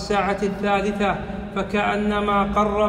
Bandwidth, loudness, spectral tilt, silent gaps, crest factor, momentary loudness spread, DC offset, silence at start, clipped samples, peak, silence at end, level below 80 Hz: 11.5 kHz; -22 LUFS; -6 dB/octave; none; 14 dB; 6 LU; under 0.1%; 0 s; under 0.1%; -8 dBFS; 0 s; -38 dBFS